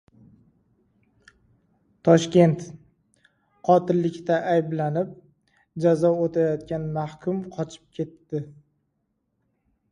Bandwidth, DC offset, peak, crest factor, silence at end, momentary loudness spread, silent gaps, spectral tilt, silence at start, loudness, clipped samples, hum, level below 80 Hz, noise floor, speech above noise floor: 10.5 kHz; under 0.1%; -4 dBFS; 22 dB; 1.4 s; 15 LU; none; -7.5 dB/octave; 2.05 s; -24 LUFS; under 0.1%; none; -62 dBFS; -75 dBFS; 52 dB